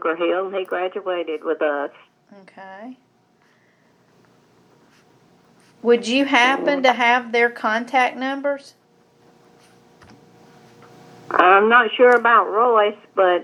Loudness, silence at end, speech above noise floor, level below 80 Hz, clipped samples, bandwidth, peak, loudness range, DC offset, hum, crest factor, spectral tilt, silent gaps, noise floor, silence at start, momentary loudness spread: -18 LUFS; 0 s; 41 dB; -78 dBFS; under 0.1%; 11 kHz; 0 dBFS; 13 LU; under 0.1%; 60 Hz at -70 dBFS; 20 dB; -3.5 dB/octave; none; -59 dBFS; 0.05 s; 13 LU